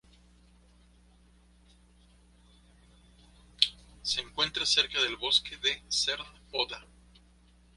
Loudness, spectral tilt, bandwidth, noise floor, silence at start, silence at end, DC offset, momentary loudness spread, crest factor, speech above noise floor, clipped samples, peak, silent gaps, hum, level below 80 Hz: -28 LUFS; 0 dB/octave; 11.5 kHz; -61 dBFS; 3.6 s; 0.95 s; under 0.1%; 11 LU; 32 dB; 30 dB; under 0.1%; -2 dBFS; none; 60 Hz at -60 dBFS; -58 dBFS